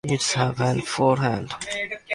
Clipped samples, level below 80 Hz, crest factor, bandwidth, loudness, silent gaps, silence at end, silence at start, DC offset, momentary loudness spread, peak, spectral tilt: under 0.1%; -54 dBFS; 18 dB; 11.5 kHz; -23 LUFS; none; 0 s; 0.05 s; under 0.1%; 8 LU; -6 dBFS; -4.5 dB/octave